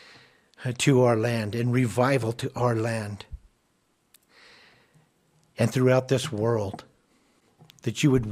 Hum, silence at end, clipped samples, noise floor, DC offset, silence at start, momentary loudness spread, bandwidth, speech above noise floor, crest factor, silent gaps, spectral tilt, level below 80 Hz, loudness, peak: none; 0 s; under 0.1%; -69 dBFS; under 0.1%; 0.6 s; 15 LU; 15 kHz; 46 dB; 20 dB; none; -6 dB/octave; -54 dBFS; -25 LUFS; -6 dBFS